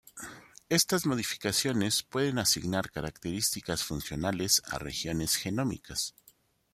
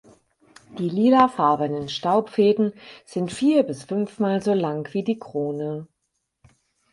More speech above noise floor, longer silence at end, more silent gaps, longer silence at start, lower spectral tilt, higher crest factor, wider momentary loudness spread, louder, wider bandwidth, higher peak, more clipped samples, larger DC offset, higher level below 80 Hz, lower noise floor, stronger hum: second, 33 dB vs 55 dB; second, 0.65 s vs 1.05 s; neither; second, 0.15 s vs 0.7 s; second, -3 dB/octave vs -6.5 dB/octave; about the same, 22 dB vs 20 dB; about the same, 10 LU vs 12 LU; second, -30 LUFS vs -22 LUFS; first, 16 kHz vs 11.5 kHz; second, -10 dBFS vs -2 dBFS; neither; neither; first, -56 dBFS vs -64 dBFS; second, -64 dBFS vs -76 dBFS; neither